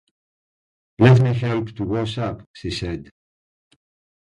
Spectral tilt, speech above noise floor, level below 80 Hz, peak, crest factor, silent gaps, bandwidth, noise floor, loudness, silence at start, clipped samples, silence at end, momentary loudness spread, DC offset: -7.5 dB/octave; over 71 dB; -46 dBFS; 0 dBFS; 22 dB; 2.46-2.54 s; 9.8 kHz; under -90 dBFS; -20 LUFS; 1 s; under 0.1%; 1.2 s; 16 LU; under 0.1%